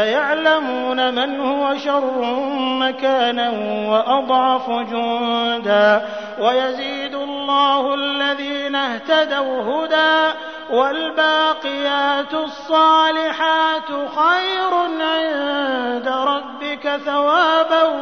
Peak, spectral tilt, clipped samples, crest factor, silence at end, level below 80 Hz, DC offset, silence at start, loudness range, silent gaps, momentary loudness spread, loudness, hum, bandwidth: -4 dBFS; -4 dB/octave; under 0.1%; 14 dB; 0 s; -64 dBFS; 0.2%; 0 s; 2 LU; none; 8 LU; -18 LUFS; none; 6.6 kHz